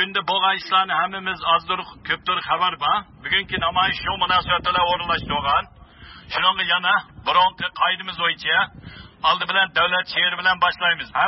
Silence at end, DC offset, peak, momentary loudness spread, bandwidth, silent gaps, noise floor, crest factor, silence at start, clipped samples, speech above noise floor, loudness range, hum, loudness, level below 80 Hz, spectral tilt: 0 s; under 0.1%; -6 dBFS; 6 LU; 6 kHz; none; -44 dBFS; 16 dB; 0 s; under 0.1%; 23 dB; 1 LU; none; -20 LUFS; -48 dBFS; -5 dB/octave